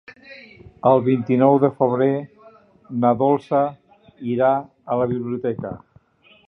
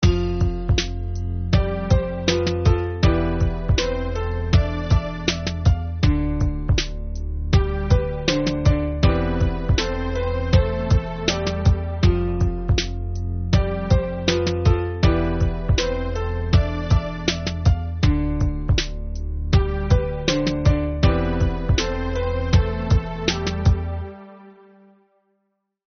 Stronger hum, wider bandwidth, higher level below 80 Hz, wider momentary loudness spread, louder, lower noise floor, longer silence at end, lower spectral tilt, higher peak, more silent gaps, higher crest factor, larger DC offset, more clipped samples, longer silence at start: neither; second, 5.6 kHz vs 6.6 kHz; second, -58 dBFS vs -26 dBFS; first, 17 LU vs 6 LU; about the same, -20 LUFS vs -22 LUFS; second, -54 dBFS vs -73 dBFS; second, 0.7 s vs 1.4 s; first, -10.5 dB/octave vs -6 dB/octave; about the same, -2 dBFS vs -4 dBFS; neither; about the same, 18 dB vs 16 dB; neither; neither; about the same, 0.1 s vs 0 s